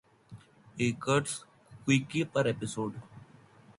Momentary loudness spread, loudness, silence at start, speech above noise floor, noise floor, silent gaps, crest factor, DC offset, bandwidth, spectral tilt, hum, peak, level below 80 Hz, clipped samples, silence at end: 12 LU; -31 LUFS; 0.3 s; 27 dB; -57 dBFS; none; 20 dB; under 0.1%; 11.5 kHz; -5 dB/octave; none; -14 dBFS; -66 dBFS; under 0.1%; 0.05 s